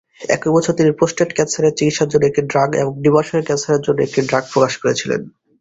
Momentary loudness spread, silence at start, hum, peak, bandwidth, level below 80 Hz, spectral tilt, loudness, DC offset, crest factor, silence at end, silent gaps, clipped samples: 4 LU; 0.2 s; none; -2 dBFS; 8 kHz; -52 dBFS; -5 dB/octave; -16 LUFS; under 0.1%; 16 dB; 0.3 s; none; under 0.1%